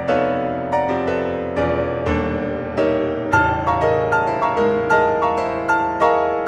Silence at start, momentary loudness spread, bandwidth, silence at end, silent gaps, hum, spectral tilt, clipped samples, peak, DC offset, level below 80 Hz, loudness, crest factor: 0 s; 5 LU; 11 kHz; 0 s; none; none; -7 dB/octave; under 0.1%; -4 dBFS; under 0.1%; -40 dBFS; -19 LUFS; 16 dB